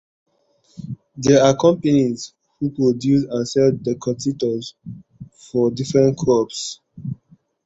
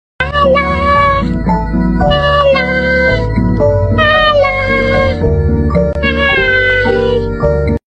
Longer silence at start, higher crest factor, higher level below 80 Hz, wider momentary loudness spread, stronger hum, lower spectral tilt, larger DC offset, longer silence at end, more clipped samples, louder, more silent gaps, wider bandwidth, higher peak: first, 0.8 s vs 0.2 s; first, 18 dB vs 10 dB; second, -54 dBFS vs -22 dBFS; first, 19 LU vs 5 LU; neither; second, -6 dB/octave vs -7.5 dB/octave; neither; first, 0.5 s vs 0.1 s; neither; second, -19 LUFS vs -11 LUFS; neither; about the same, 8 kHz vs 8.6 kHz; about the same, -2 dBFS vs 0 dBFS